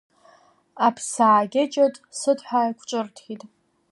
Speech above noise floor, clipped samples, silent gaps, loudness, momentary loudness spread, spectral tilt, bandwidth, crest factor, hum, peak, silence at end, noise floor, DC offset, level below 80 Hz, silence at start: 34 dB; under 0.1%; none; -22 LUFS; 17 LU; -4 dB/octave; 11.5 kHz; 18 dB; none; -6 dBFS; 0.45 s; -56 dBFS; under 0.1%; -78 dBFS; 0.75 s